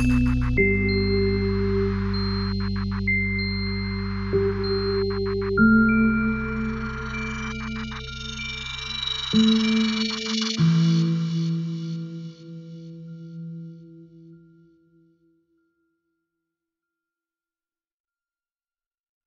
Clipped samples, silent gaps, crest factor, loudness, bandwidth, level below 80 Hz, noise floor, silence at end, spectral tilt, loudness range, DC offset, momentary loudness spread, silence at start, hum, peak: under 0.1%; none; 18 dB; -23 LUFS; 7.6 kHz; -36 dBFS; under -90 dBFS; 4.9 s; -6 dB/octave; 17 LU; under 0.1%; 18 LU; 0 s; none; -6 dBFS